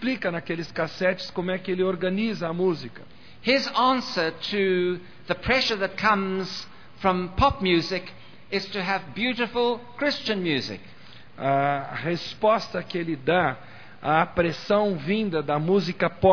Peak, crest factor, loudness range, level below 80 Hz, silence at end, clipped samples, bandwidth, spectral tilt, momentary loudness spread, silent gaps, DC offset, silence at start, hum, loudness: -6 dBFS; 20 dB; 3 LU; -48 dBFS; 0 s; under 0.1%; 5.4 kHz; -6 dB/octave; 9 LU; none; 0.5%; 0 s; none; -25 LUFS